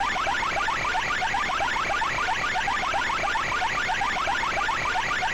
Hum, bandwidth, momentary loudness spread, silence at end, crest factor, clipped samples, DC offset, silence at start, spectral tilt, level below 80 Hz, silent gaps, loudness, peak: none; over 20 kHz; 0 LU; 0 s; 8 dB; under 0.1%; under 0.1%; 0 s; -2 dB/octave; -44 dBFS; none; -25 LUFS; -18 dBFS